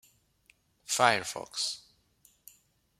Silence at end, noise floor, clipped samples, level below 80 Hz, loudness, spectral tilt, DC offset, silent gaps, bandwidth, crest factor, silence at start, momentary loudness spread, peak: 1.2 s; -67 dBFS; under 0.1%; -74 dBFS; -29 LUFS; -1.5 dB/octave; under 0.1%; none; 16 kHz; 30 dB; 0.9 s; 17 LU; -4 dBFS